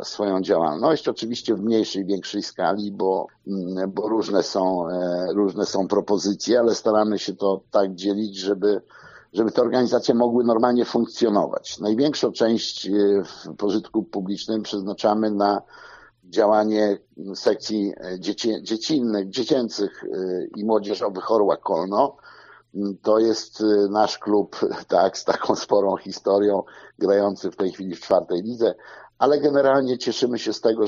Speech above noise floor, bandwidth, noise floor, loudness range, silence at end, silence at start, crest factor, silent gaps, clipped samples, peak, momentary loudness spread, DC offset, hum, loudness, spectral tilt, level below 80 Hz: 26 dB; 7.4 kHz; -48 dBFS; 3 LU; 0 s; 0 s; 20 dB; none; under 0.1%; -2 dBFS; 8 LU; under 0.1%; none; -22 LUFS; -4.5 dB/octave; -66 dBFS